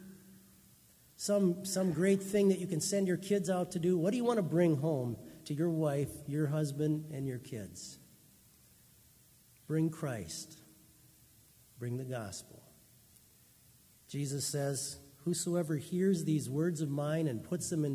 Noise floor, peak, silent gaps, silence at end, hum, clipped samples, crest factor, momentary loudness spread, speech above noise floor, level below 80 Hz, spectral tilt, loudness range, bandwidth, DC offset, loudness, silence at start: -63 dBFS; -16 dBFS; none; 0 s; none; under 0.1%; 18 dB; 14 LU; 30 dB; -68 dBFS; -6 dB/octave; 12 LU; 16 kHz; under 0.1%; -34 LUFS; 0 s